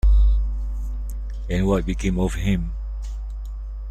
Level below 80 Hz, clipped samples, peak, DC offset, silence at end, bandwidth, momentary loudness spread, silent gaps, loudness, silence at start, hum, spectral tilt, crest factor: -22 dBFS; under 0.1%; -8 dBFS; under 0.1%; 0 s; 9.2 kHz; 13 LU; none; -25 LUFS; 0.05 s; none; -7 dB/octave; 14 dB